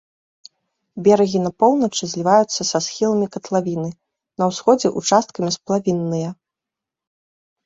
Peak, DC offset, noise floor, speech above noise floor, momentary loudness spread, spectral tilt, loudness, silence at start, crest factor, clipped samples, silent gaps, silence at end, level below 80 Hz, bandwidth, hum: -2 dBFS; under 0.1%; -86 dBFS; 68 dB; 10 LU; -5 dB/octave; -19 LUFS; 0.95 s; 18 dB; under 0.1%; none; 1.3 s; -62 dBFS; 8 kHz; none